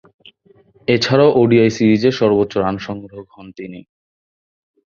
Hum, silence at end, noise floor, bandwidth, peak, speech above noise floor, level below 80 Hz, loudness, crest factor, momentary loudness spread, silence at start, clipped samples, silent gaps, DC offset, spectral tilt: none; 1.1 s; -52 dBFS; 7.2 kHz; -2 dBFS; 37 dB; -52 dBFS; -15 LUFS; 16 dB; 21 LU; 0.9 s; under 0.1%; none; under 0.1%; -6.5 dB/octave